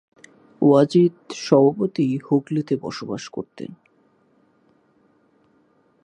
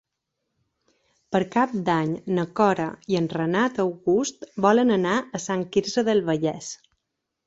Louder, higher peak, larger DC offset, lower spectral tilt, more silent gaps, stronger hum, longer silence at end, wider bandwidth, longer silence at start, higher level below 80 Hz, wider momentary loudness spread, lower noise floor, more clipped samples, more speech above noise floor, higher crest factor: first, -20 LUFS vs -23 LUFS; about the same, -2 dBFS vs -4 dBFS; neither; first, -7.5 dB/octave vs -5.5 dB/octave; neither; neither; first, 2.3 s vs 0.7 s; first, 10 kHz vs 8 kHz; second, 0.6 s vs 1.3 s; second, -68 dBFS vs -62 dBFS; first, 17 LU vs 8 LU; second, -61 dBFS vs -81 dBFS; neither; second, 41 dB vs 58 dB; about the same, 22 dB vs 20 dB